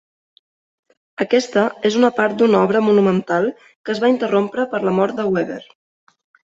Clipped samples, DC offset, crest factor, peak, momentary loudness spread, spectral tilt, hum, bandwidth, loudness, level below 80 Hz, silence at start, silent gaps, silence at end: under 0.1%; under 0.1%; 16 dB; -2 dBFS; 11 LU; -6 dB/octave; none; 8 kHz; -17 LUFS; -62 dBFS; 1.2 s; 3.76-3.84 s; 0.95 s